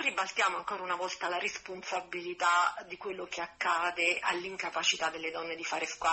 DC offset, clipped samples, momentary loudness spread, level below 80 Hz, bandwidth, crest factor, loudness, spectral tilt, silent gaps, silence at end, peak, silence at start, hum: under 0.1%; under 0.1%; 10 LU; -72 dBFS; 8.6 kHz; 18 dB; -32 LUFS; -1 dB/octave; none; 0 s; -14 dBFS; 0 s; none